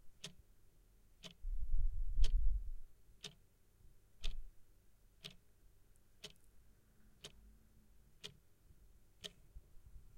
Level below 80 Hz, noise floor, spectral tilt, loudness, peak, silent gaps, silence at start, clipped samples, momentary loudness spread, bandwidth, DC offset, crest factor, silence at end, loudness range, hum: -44 dBFS; -68 dBFS; -3.5 dB/octave; -49 LUFS; -18 dBFS; none; 0.05 s; under 0.1%; 25 LU; 9.6 kHz; under 0.1%; 22 dB; 0.2 s; 14 LU; none